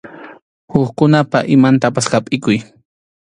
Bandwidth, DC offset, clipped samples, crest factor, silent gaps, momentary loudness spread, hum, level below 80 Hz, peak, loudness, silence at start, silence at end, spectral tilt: 11 kHz; under 0.1%; under 0.1%; 14 dB; 0.42-0.68 s; 8 LU; none; -52 dBFS; 0 dBFS; -14 LUFS; 0.05 s; 0.7 s; -6 dB/octave